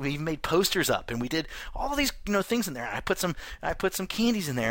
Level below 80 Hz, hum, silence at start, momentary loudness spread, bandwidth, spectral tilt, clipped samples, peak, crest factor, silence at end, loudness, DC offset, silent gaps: -44 dBFS; none; 0 s; 8 LU; 17 kHz; -4 dB/octave; under 0.1%; -12 dBFS; 16 dB; 0 s; -28 LUFS; under 0.1%; none